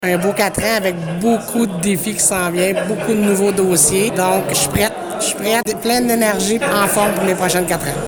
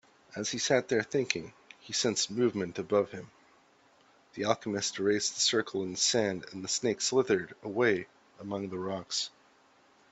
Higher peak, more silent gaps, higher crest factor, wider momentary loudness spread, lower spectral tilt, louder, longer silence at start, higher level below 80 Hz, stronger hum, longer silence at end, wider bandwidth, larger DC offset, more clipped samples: first, -2 dBFS vs -8 dBFS; neither; second, 14 dB vs 24 dB; second, 5 LU vs 11 LU; about the same, -3.5 dB/octave vs -3 dB/octave; first, -16 LUFS vs -30 LUFS; second, 0 s vs 0.3 s; first, -44 dBFS vs -72 dBFS; neither; second, 0 s vs 0.85 s; first, over 20 kHz vs 8.4 kHz; neither; neither